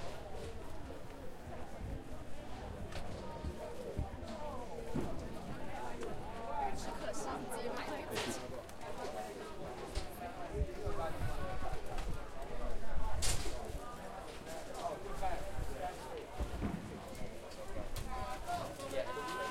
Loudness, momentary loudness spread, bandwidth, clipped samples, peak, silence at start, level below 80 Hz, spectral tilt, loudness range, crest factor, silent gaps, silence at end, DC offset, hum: -44 LUFS; 8 LU; 16 kHz; under 0.1%; -20 dBFS; 0 s; -46 dBFS; -4.5 dB/octave; 4 LU; 18 dB; none; 0 s; under 0.1%; none